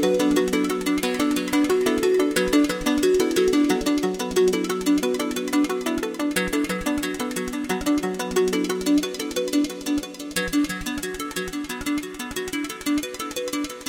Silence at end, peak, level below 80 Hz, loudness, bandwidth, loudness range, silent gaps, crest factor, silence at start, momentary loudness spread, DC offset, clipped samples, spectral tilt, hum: 0 s; -2 dBFS; -46 dBFS; -23 LUFS; 17 kHz; 6 LU; none; 20 dB; 0 s; 8 LU; under 0.1%; under 0.1%; -4 dB/octave; none